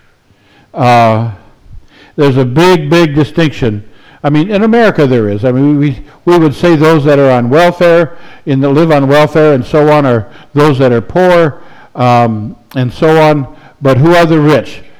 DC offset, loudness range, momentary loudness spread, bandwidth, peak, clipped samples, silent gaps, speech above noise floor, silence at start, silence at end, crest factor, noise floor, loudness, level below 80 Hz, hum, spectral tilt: under 0.1%; 3 LU; 10 LU; over 20 kHz; 0 dBFS; under 0.1%; none; 39 dB; 0.75 s; 0.1 s; 8 dB; -47 dBFS; -8 LUFS; -36 dBFS; none; -7.5 dB/octave